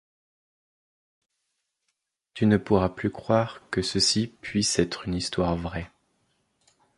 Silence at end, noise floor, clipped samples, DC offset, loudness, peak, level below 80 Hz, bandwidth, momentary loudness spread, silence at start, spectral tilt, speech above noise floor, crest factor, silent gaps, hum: 1.1 s; -79 dBFS; under 0.1%; under 0.1%; -25 LUFS; -6 dBFS; -48 dBFS; 11.5 kHz; 10 LU; 2.35 s; -4.5 dB/octave; 54 dB; 22 dB; none; none